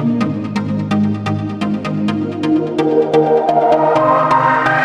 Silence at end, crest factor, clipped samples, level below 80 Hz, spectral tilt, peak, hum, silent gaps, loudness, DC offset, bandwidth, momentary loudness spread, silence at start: 0 s; 14 dB; under 0.1%; -52 dBFS; -7.5 dB/octave; -2 dBFS; none; none; -15 LUFS; under 0.1%; 10 kHz; 7 LU; 0 s